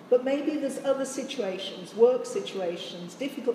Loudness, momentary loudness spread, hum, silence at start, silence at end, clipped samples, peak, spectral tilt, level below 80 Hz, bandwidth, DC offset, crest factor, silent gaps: -28 LUFS; 12 LU; none; 0 s; 0 s; under 0.1%; -8 dBFS; -4 dB/octave; -86 dBFS; 14.5 kHz; under 0.1%; 20 dB; none